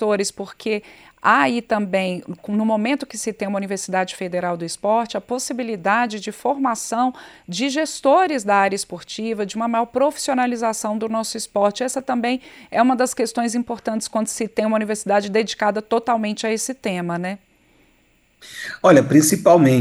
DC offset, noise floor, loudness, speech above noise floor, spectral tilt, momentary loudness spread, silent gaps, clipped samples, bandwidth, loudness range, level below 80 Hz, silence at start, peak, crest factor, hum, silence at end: under 0.1%; -59 dBFS; -20 LUFS; 39 dB; -4.5 dB/octave; 10 LU; none; under 0.1%; 16 kHz; 3 LU; -62 dBFS; 0 s; -2 dBFS; 18 dB; none; 0 s